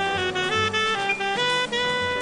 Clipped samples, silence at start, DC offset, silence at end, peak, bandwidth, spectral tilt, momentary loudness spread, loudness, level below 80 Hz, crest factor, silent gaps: under 0.1%; 0 s; under 0.1%; 0 s; -12 dBFS; 11 kHz; -3 dB/octave; 2 LU; -22 LUFS; -56 dBFS; 12 dB; none